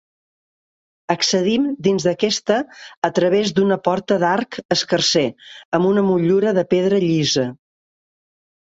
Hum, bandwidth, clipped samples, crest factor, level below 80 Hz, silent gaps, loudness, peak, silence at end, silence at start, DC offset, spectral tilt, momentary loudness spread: none; 8 kHz; under 0.1%; 16 dB; -60 dBFS; 2.97-3.02 s, 4.65-4.69 s, 5.65-5.72 s; -18 LUFS; -2 dBFS; 1.2 s; 1.1 s; under 0.1%; -4.5 dB/octave; 6 LU